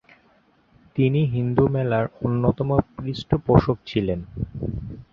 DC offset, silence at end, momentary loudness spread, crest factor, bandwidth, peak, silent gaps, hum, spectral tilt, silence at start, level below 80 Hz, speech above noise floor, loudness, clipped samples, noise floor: under 0.1%; 0.1 s; 12 LU; 22 dB; 6.8 kHz; -2 dBFS; none; none; -9.5 dB/octave; 0.95 s; -40 dBFS; 38 dB; -23 LUFS; under 0.1%; -60 dBFS